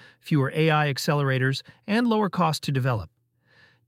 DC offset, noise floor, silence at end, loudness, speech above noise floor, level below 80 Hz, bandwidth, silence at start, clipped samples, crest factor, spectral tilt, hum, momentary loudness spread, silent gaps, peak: under 0.1%; -61 dBFS; 0.8 s; -24 LUFS; 37 dB; -58 dBFS; 16 kHz; 0.25 s; under 0.1%; 18 dB; -6 dB/octave; none; 5 LU; none; -8 dBFS